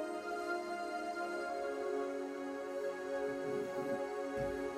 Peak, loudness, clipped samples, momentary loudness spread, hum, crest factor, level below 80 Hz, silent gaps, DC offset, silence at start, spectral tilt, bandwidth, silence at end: -26 dBFS; -40 LUFS; under 0.1%; 2 LU; none; 14 dB; -68 dBFS; none; under 0.1%; 0 s; -5 dB/octave; 15.5 kHz; 0 s